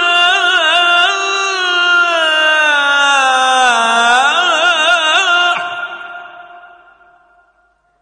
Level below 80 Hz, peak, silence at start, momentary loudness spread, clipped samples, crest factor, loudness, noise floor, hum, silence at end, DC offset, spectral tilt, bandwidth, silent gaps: -62 dBFS; 0 dBFS; 0 s; 8 LU; under 0.1%; 12 dB; -10 LUFS; -57 dBFS; none; 1.35 s; under 0.1%; 1 dB/octave; 10 kHz; none